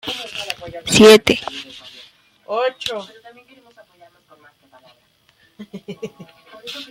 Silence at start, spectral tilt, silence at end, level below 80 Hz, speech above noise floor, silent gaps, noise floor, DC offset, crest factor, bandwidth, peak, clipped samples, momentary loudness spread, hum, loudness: 0.05 s; -3.5 dB/octave; 0.05 s; -54 dBFS; 42 dB; none; -58 dBFS; under 0.1%; 20 dB; 16 kHz; 0 dBFS; under 0.1%; 28 LU; none; -15 LUFS